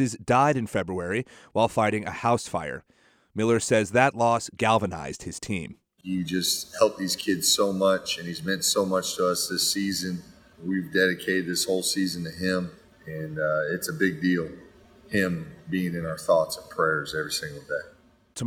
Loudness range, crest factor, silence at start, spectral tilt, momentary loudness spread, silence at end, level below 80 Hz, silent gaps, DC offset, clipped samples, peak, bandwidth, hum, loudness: 4 LU; 22 dB; 0 s; -3.5 dB/octave; 12 LU; 0 s; -60 dBFS; none; under 0.1%; under 0.1%; -4 dBFS; 19 kHz; none; -26 LUFS